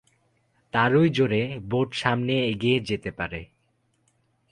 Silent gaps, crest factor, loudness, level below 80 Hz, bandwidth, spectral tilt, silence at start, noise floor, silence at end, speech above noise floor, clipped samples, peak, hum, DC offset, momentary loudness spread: none; 20 dB; -24 LUFS; -54 dBFS; 11 kHz; -6.5 dB/octave; 0.75 s; -69 dBFS; 1.05 s; 46 dB; under 0.1%; -6 dBFS; none; under 0.1%; 11 LU